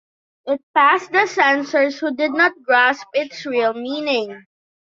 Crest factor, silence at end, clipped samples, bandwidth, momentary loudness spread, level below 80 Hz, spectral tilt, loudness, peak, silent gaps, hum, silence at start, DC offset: 18 dB; 0.55 s; under 0.1%; 7.6 kHz; 10 LU; -70 dBFS; -3 dB/octave; -18 LUFS; -2 dBFS; 0.63-0.74 s; none; 0.45 s; under 0.1%